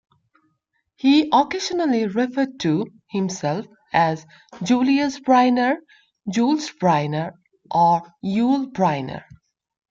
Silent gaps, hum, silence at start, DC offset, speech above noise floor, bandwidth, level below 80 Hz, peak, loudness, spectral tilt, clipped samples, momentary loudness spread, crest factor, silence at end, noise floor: none; none; 1.05 s; under 0.1%; 52 dB; 7.6 kHz; -64 dBFS; -4 dBFS; -21 LUFS; -5.5 dB/octave; under 0.1%; 11 LU; 16 dB; 0.7 s; -72 dBFS